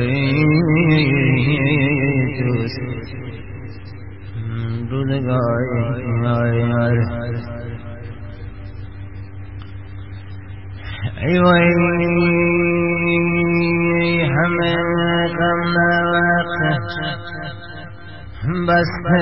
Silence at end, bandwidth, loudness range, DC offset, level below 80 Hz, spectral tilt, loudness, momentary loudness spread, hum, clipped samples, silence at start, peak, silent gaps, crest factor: 0 s; 5.8 kHz; 10 LU; 1%; -40 dBFS; -12 dB/octave; -17 LUFS; 19 LU; none; under 0.1%; 0 s; -2 dBFS; none; 16 dB